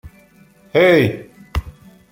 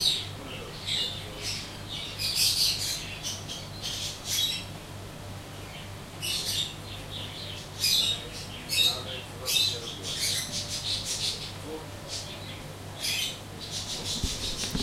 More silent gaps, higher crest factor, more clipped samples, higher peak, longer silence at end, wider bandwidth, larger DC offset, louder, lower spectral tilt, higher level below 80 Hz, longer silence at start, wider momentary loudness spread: neither; second, 16 dB vs 22 dB; neither; first, -2 dBFS vs -10 dBFS; first, 0.4 s vs 0 s; about the same, 16.5 kHz vs 16 kHz; neither; first, -16 LUFS vs -29 LUFS; first, -7 dB/octave vs -1.5 dB/octave; first, -34 dBFS vs -48 dBFS; about the same, 0.05 s vs 0 s; about the same, 15 LU vs 16 LU